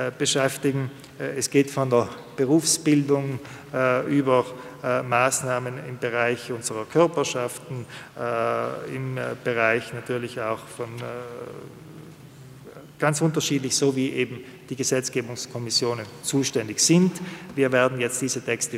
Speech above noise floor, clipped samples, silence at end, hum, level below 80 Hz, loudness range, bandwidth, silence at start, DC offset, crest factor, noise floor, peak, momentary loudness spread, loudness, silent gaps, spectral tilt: 20 dB; under 0.1%; 0 s; none; -66 dBFS; 6 LU; 16 kHz; 0 s; under 0.1%; 20 dB; -45 dBFS; -6 dBFS; 15 LU; -24 LUFS; none; -4 dB/octave